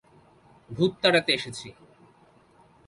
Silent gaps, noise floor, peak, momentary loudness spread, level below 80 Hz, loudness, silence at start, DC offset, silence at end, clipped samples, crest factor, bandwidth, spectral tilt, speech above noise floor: none; -58 dBFS; -6 dBFS; 21 LU; -64 dBFS; -24 LUFS; 0.7 s; under 0.1%; 1.15 s; under 0.1%; 22 dB; 11.5 kHz; -4.5 dB/octave; 33 dB